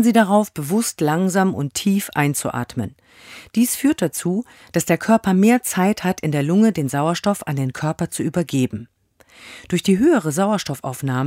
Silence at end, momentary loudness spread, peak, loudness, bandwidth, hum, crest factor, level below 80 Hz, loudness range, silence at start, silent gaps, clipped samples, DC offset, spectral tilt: 0 s; 10 LU; -2 dBFS; -19 LUFS; 16 kHz; none; 18 dB; -54 dBFS; 3 LU; 0 s; none; under 0.1%; under 0.1%; -5.5 dB/octave